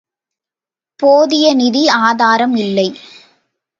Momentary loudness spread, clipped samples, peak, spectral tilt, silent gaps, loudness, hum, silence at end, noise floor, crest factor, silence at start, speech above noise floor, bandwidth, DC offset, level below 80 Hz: 6 LU; under 0.1%; 0 dBFS; -4 dB/octave; none; -12 LUFS; none; 0.85 s; -89 dBFS; 14 dB; 1 s; 78 dB; 7.6 kHz; under 0.1%; -66 dBFS